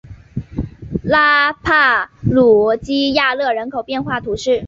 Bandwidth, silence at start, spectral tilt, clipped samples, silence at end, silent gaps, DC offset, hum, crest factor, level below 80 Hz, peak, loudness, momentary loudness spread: 7.8 kHz; 0.05 s; -5.5 dB/octave; under 0.1%; 0 s; none; under 0.1%; none; 14 dB; -38 dBFS; -2 dBFS; -15 LUFS; 15 LU